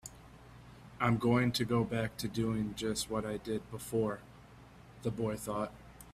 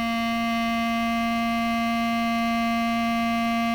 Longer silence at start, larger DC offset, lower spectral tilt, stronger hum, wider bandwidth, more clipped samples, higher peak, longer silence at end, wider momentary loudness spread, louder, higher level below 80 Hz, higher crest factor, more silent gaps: about the same, 0.05 s vs 0 s; neither; about the same, -5.5 dB/octave vs -4.5 dB/octave; neither; second, 15.5 kHz vs over 20 kHz; neither; first, -14 dBFS vs -18 dBFS; about the same, 0 s vs 0 s; first, 24 LU vs 1 LU; second, -35 LUFS vs -24 LUFS; second, -58 dBFS vs -48 dBFS; first, 20 dB vs 6 dB; neither